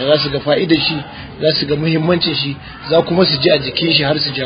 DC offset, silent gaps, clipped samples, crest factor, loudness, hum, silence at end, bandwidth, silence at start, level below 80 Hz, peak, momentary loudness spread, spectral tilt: under 0.1%; none; under 0.1%; 16 dB; -14 LUFS; none; 0 s; 5.2 kHz; 0 s; -42 dBFS; 0 dBFS; 7 LU; -8.5 dB/octave